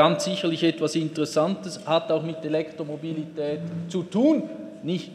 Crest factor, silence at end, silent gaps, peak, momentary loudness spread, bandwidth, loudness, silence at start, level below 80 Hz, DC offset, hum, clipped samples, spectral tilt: 20 dB; 0 s; none; -4 dBFS; 10 LU; 13 kHz; -26 LUFS; 0 s; -74 dBFS; under 0.1%; none; under 0.1%; -5.5 dB/octave